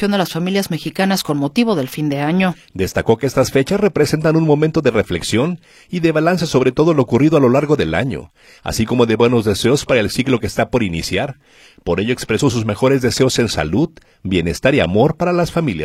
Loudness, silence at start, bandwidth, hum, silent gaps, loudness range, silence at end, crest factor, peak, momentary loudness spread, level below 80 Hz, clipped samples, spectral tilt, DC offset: -16 LUFS; 0 s; 16 kHz; none; none; 3 LU; 0 s; 16 dB; 0 dBFS; 7 LU; -40 dBFS; under 0.1%; -5.5 dB/octave; under 0.1%